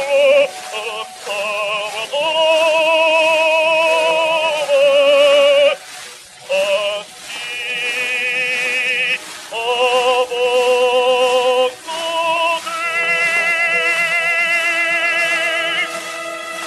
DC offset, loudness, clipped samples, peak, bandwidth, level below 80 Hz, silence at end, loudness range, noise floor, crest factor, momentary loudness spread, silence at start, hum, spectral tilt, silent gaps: under 0.1%; -15 LUFS; under 0.1%; 0 dBFS; 13 kHz; -68 dBFS; 0 s; 5 LU; -36 dBFS; 16 dB; 12 LU; 0 s; none; -0.5 dB/octave; none